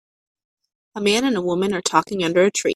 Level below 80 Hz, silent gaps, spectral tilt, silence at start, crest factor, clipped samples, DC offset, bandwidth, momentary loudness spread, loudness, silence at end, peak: -60 dBFS; none; -3.5 dB/octave; 0.95 s; 20 dB; under 0.1%; under 0.1%; 13.5 kHz; 4 LU; -19 LUFS; 0 s; 0 dBFS